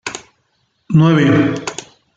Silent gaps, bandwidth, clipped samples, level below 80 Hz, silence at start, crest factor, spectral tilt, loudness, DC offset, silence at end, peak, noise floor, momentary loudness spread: none; 9.2 kHz; under 0.1%; -52 dBFS; 0.05 s; 14 dB; -6.5 dB/octave; -13 LUFS; under 0.1%; 0.35 s; -2 dBFS; -64 dBFS; 20 LU